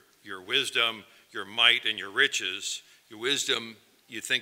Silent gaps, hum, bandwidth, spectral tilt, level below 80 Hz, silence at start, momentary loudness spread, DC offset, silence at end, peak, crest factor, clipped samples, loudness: none; none; 16 kHz; 0 dB/octave; -84 dBFS; 0.25 s; 21 LU; under 0.1%; 0 s; -6 dBFS; 24 dB; under 0.1%; -26 LUFS